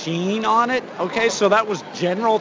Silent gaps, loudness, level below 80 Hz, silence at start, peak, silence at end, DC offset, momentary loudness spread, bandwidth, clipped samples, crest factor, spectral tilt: none; -20 LUFS; -62 dBFS; 0 s; -4 dBFS; 0 s; under 0.1%; 7 LU; 7.6 kHz; under 0.1%; 16 dB; -4.5 dB/octave